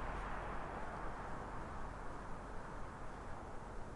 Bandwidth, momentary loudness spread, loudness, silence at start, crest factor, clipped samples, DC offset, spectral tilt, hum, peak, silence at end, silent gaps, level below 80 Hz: 11.5 kHz; 5 LU; -48 LUFS; 0 s; 12 dB; under 0.1%; under 0.1%; -6 dB/octave; none; -32 dBFS; 0 s; none; -50 dBFS